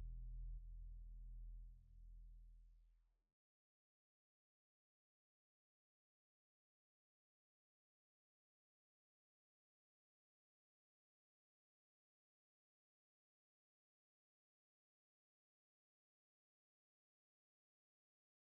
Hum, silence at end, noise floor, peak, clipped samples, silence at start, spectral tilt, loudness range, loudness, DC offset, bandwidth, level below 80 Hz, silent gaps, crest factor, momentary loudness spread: none; 15.45 s; -76 dBFS; -44 dBFS; under 0.1%; 0 s; -20.5 dB/octave; 7 LU; -61 LUFS; under 0.1%; 0.4 kHz; -64 dBFS; none; 18 dB; 10 LU